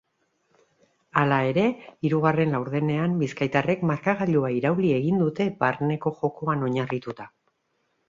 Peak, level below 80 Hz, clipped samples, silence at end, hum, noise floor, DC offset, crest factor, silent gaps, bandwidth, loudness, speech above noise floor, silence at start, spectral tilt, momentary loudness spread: -4 dBFS; -62 dBFS; under 0.1%; 0.8 s; none; -73 dBFS; under 0.1%; 22 dB; none; 7.6 kHz; -24 LUFS; 49 dB; 1.15 s; -8 dB/octave; 6 LU